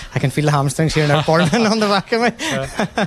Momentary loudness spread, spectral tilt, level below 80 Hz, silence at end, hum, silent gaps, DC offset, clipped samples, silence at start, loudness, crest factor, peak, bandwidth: 7 LU; -5.5 dB/octave; -42 dBFS; 0 s; none; none; under 0.1%; under 0.1%; 0 s; -17 LUFS; 14 dB; -2 dBFS; 13.5 kHz